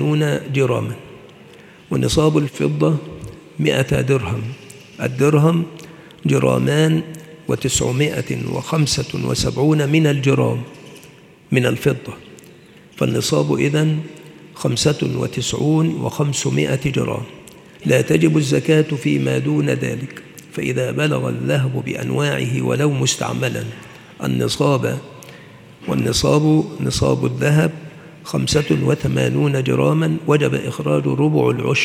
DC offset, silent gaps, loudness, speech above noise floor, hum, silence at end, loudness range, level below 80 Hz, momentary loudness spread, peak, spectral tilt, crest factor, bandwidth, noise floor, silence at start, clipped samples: under 0.1%; none; -18 LUFS; 27 dB; none; 0 s; 3 LU; -46 dBFS; 13 LU; 0 dBFS; -5.5 dB/octave; 18 dB; 15 kHz; -44 dBFS; 0 s; under 0.1%